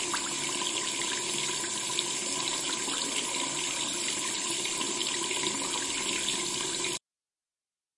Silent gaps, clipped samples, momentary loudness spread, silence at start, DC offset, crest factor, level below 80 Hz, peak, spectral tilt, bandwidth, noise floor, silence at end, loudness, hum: none; under 0.1%; 1 LU; 0 s; under 0.1%; 22 dB; -68 dBFS; -10 dBFS; 0 dB/octave; 11.5 kHz; under -90 dBFS; 1 s; -29 LUFS; none